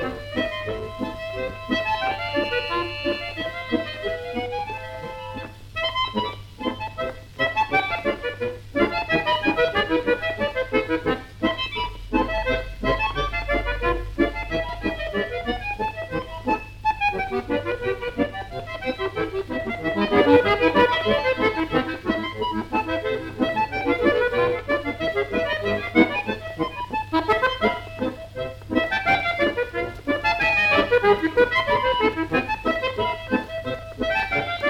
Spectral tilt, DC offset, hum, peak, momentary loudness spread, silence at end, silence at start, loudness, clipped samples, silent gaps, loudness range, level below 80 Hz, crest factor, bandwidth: -6 dB/octave; under 0.1%; none; -4 dBFS; 11 LU; 0 s; 0 s; -23 LUFS; under 0.1%; none; 6 LU; -40 dBFS; 20 dB; 16 kHz